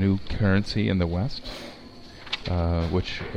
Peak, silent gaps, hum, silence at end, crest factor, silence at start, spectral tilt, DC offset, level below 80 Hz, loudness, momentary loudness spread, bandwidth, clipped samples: -8 dBFS; none; none; 0 s; 18 dB; 0 s; -7 dB/octave; under 0.1%; -38 dBFS; -26 LUFS; 18 LU; 9.2 kHz; under 0.1%